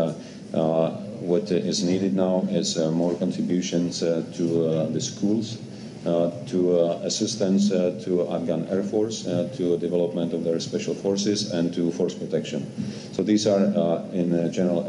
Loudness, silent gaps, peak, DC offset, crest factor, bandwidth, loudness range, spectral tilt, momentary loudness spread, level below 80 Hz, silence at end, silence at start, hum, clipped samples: -24 LUFS; none; -8 dBFS; under 0.1%; 16 dB; 10.5 kHz; 2 LU; -5.5 dB/octave; 7 LU; -66 dBFS; 0 s; 0 s; none; under 0.1%